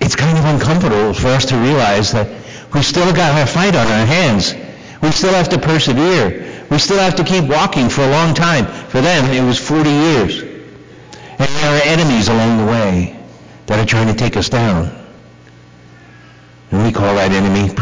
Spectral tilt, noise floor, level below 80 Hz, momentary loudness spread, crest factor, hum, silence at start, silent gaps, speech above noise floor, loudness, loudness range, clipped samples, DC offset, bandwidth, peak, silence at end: -5 dB/octave; -40 dBFS; -34 dBFS; 7 LU; 8 dB; none; 0 s; none; 28 dB; -13 LUFS; 5 LU; under 0.1%; 0.8%; 7.6 kHz; -6 dBFS; 0 s